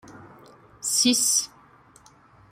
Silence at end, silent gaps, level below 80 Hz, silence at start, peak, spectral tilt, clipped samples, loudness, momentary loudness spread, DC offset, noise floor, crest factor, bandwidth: 1.05 s; none; -66 dBFS; 0.1 s; -6 dBFS; -0.5 dB/octave; under 0.1%; -21 LUFS; 14 LU; under 0.1%; -54 dBFS; 20 dB; 16 kHz